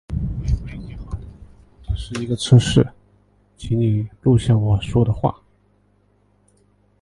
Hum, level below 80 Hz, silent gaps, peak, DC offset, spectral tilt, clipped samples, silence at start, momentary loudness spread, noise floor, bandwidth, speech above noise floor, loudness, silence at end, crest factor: 50 Hz at -40 dBFS; -34 dBFS; none; 0 dBFS; under 0.1%; -7 dB/octave; under 0.1%; 0.1 s; 19 LU; -59 dBFS; 11.5 kHz; 42 dB; -19 LUFS; 1.7 s; 20 dB